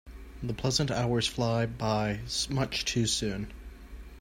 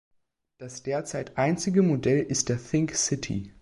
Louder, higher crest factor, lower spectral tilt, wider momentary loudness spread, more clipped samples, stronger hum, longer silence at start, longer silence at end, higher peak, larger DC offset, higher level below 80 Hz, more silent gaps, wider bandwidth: second, -30 LUFS vs -26 LUFS; about the same, 20 dB vs 18 dB; about the same, -4.5 dB/octave vs -5 dB/octave; first, 20 LU vs 11 LU; neither; neither; second, 0.05 s vs 0.6 s; about the same, 0 s vs 0.1 s; second, -12 dBFS vs -8 dBFS; neither; first, -46 dBFS vs -54 dBFS; neither; first, 16 kHz vs 11.5 kHz